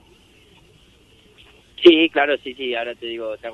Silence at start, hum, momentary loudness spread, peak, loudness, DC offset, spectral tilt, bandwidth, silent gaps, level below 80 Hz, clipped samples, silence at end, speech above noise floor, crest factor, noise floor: 1.8 s; none; 16 LU; 0 dBFS; -18 LUFS; under 0.1%; -5 dB/octave; 6 kHz; none; -60 dBFS; under 0.1%; 0 s; 35 dB; 20 dB; -52 dBFS